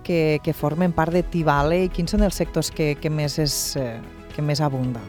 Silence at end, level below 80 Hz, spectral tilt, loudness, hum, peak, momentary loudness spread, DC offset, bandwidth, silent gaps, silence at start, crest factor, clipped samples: 0 s; -34 dBFS; -5.5 dB/octave; -22 LUFS; none; -6 dBFS; 6 LU; under 0.1%; 19.5 kHz; none; 0 s; 16 dB; under 0.1%